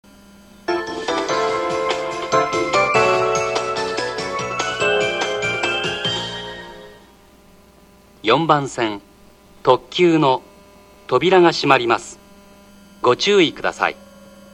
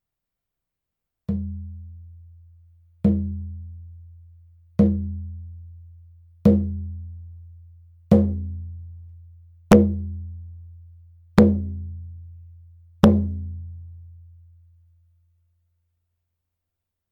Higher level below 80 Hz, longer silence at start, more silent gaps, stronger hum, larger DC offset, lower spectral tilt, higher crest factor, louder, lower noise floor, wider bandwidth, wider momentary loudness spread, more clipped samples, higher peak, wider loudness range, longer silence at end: second, -52 dBFS vs -40 dBFS; second, 0.7 s vs 1.3 s; neither; neither; neither; second, -4 dB/octave vs -8.5 dB/octave; about the same, 20 dB vs 24 dB; first, -18 LUFS vs -22 LUFS; second, -49 dBFS vs -85 dBFS; about the same, 12 kHz vs 11 kHz; second, 10 LU vs 26 LU; neither; about the same, 0 dBFS vs -2 dBFS; second, 5 LU vs 8 LU; second, 0.25 s vs 2.95 s